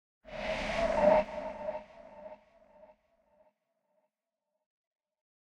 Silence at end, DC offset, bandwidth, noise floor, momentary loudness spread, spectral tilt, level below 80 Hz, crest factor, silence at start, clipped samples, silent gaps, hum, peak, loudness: 3.2 s; under 0.1%; 9.8 kHz; -88 dBFS; 25 LU; -5.5 dB/octave; -54 dBFS; 22 dB; 0.25 s; under 0.1%; none; none; -14 dBFS; -31 LUFS